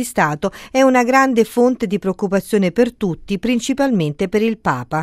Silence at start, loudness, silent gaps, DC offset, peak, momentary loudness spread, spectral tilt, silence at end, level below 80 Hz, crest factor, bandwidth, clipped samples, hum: 0 s; -17 LUFS; none; under 0.1%; 0 dBFS; 7 LU; -5.5 dB/octave; 0 s; -46 dBFS; 16 dB; 15.5 kHz; under 0.1%; none